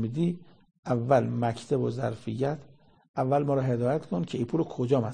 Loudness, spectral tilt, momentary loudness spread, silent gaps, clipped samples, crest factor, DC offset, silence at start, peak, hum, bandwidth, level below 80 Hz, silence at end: -28 LUFS; -8 dB/octave; 8 LU; 0.79-0.83 s, 3.09-3.14 s; under 0.1%; 20 dB; 0.1%; 0 s; -8 dBFS; none; 9.8 kHz; -62 dBFS; 0 s